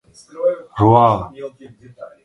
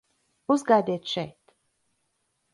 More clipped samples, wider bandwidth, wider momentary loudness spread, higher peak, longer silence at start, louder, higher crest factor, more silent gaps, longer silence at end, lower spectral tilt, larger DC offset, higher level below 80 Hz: neither; about the same, 10.5 kHz vs 11.5 kHz; first, 21 LU vs 17 LU; first, 0 dBFS vs -8 dBFS; second, 0.35 s vs 0.5 s; first, -16 LUFS vs -25 LUFS; about the same, 18 dB vs 20 dB; neither; second, 0.15 s vs 1.25 s; first, -9 dB/octave vs -5.5 dB/octave; neither; first, -46 dBFS vs -72 dBFS